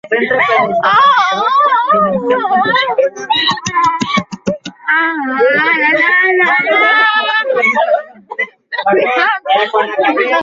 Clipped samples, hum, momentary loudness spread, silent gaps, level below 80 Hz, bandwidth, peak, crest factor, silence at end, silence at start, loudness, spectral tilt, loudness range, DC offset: under 0.1%; none; 9 LU; none; -56 dBFS; 7.8 kHz; 0 dBFS; 12 dB; 0 s; 0.05 s; -11 LUFS; -3.5 dB/octave; 3 LU; under 0.1%